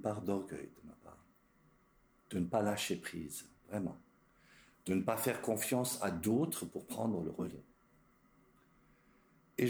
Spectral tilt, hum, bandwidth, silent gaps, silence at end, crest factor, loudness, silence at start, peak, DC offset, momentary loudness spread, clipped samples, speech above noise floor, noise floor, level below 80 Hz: -5 dB/octave; none; over 20 kHz; none; 0 s; 20 dB; -38 LUFS; 0 s; -20 dBFS; under 0.1%; 15 LU; under 0.1%; 33 dB; -70 dBFS; -70 dBFS